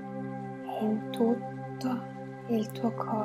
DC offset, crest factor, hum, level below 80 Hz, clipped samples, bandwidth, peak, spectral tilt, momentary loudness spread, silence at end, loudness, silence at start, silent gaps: under 0.1%; 18 dB; none; -72 dBFS; under 0.1%; 16 kHz; -14 dBFS; -7.5 dB/octave; 10 LU; 0 s; -33 LUFS; 0 s; none